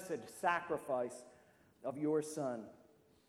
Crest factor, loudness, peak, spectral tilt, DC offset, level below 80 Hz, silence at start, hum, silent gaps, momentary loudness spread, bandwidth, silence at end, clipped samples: 20 dB; -40 LUFS; -20 dBFS; -5 dB/octave; under 0.1%; -80 dBFS; 0 s; none; none; 11 LU; 16 kHz; 0.45 s; under 0.1%